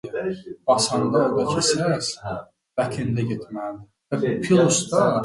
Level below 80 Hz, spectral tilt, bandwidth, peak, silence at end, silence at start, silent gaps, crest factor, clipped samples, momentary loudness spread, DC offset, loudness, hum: -56 dBFS; -4.5 dB/octave; 11.5 kHz; -4 dBFS; 0 s; 0.05 s; none; 18 dB; under 0.1%; 14 LU; under 0.1%; -22 LUFS; none